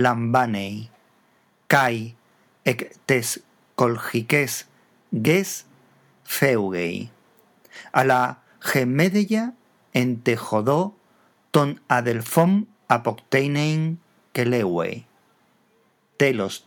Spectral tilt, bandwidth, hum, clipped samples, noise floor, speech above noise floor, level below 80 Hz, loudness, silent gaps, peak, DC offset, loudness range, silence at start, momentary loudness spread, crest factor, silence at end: -5.5 dB/octave; over 20 kHz; none; under 0.1%; -63 dBFS; 42 dB; -72 dBFS; -22 LUFS; none; 0 dBFS; under 0.1%; 3 LU; 0 s; 12 LU; 22 dB; 0.1 s